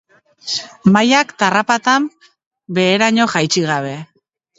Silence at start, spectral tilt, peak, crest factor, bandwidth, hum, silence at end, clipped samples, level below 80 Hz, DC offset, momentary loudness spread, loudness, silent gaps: 0.45 s; -4 dB/octave; 0 dBFS; 16 dB; 8 kHz; none; 0.55 s; under 0.1%; -60 dBFS; under 0.1%; 12 LU; -15 LUFS; 2.46-2.51 s